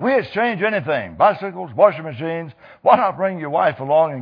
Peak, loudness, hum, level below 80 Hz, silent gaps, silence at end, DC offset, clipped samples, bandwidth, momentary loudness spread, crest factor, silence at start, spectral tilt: 0 dBFS; -19 LUFS; none; -60 dBFS; none; 0 s; under 0.1%; under 0.1%; 5.2 kHz; 11 LU; 18 dB; 0 s; -8.5 dB/octave